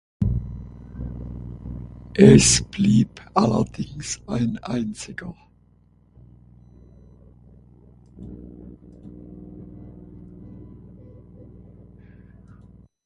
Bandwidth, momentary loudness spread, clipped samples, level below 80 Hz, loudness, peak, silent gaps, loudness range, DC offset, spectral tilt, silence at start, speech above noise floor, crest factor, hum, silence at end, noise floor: 11.5 kHz; 28 LU; under 0.1%; -40 dBFS; -20 LUFS; 0 dBFS; none; 25 LU; under 0.1%; -5 dB/octave; 0.2 s; 38 dB; 24 dB; 60 Hz at -45 dBFS; 1.65 s; -57 dBFS